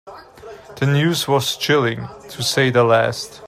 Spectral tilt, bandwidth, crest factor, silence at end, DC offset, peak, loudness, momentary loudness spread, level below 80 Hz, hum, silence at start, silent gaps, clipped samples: -4.5 dB/octave; 16 kHz; 18 dB; 0 s; under 0.1%; -2 dBFS; -17 LUFS; 11 LU; -56 dBFS; none; 0.05 s; none; under 0.1%